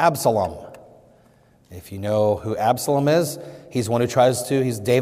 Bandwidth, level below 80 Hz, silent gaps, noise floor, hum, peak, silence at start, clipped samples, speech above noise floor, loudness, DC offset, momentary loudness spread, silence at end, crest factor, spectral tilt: 16 kHz; -58 dBFS; none; -55 dBFS; none; -4 dBFS; 0 s; under 0.1%; 35 dB; -21 LUFS; under 0.1%; 14 LU; 0 s; 16 dB; -5.5 dB/octave